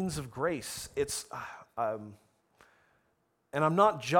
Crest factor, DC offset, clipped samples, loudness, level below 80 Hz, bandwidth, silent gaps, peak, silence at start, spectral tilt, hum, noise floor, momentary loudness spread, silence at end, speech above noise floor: 22 dB; under 0.1%; under 0.1%; -32 LUFS; -62 dBFS; 19 kHz; none; -12 dBFS; 0 s; -4.5 dB/octave; none; -75 dBFS; 17 LU; 0 s; 44 dB